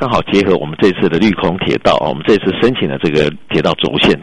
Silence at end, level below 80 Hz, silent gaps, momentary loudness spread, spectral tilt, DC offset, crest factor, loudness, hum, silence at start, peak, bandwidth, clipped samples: 0 s; -38 dBFS; none; 3 LU; -6.5 dB/octave; under 0.1%; 12 dB; -13 LUFS; none; 0 s; 0 dBFS; 10.5 kHz; under 0.1%